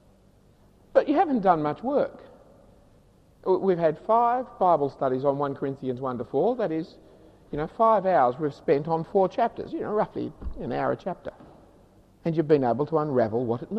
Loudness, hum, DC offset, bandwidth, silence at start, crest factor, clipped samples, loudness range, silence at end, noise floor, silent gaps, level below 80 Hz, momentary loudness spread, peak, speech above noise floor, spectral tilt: -25 LUFS; none; under 0.1%; 7.8 kHz; 0.95 s; 18 dB; under 0.1%; 3 LU; 0 s; -58 dBFS; none; -52 dBFS; 11 LU; -8 dBFS; 33 dB; -9 dB/octave